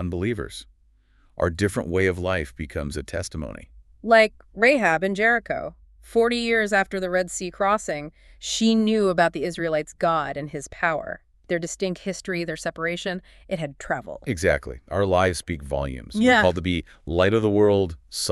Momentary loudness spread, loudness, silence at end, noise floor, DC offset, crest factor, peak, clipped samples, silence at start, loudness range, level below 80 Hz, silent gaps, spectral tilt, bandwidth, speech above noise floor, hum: 13 LU; -23 LUFS; 0 s; -59 dBFS; under 0.1%; 20 dB; -4 dBFS; under 0.1%; 0 s; 6 LU; -44 dBFS; none; -5 dB/octave; 13.5 kHz; 36 dB; none